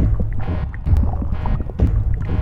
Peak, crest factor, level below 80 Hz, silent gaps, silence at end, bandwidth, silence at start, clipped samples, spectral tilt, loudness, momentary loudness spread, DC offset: -4 dBFS; 14 dB; -20 dBFS; none; 0 s; 4.6 kHz; 0 s; under 0.1%; -10 dB/octave; -22 LUFS; 5 LU; under 0.1%